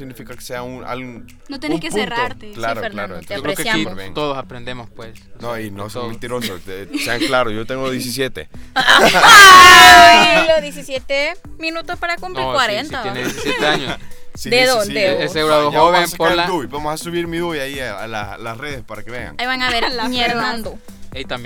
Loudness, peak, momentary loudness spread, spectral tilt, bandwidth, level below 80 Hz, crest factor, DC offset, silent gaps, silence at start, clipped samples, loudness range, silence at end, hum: -11 LUFS; 0 dBFS; 22 LU; -2 dB/octave; over 20 kHz; -38 dBFS; 14 dB; under 0.1%; none; 0 s; 2%; 18 LU; 0 s; none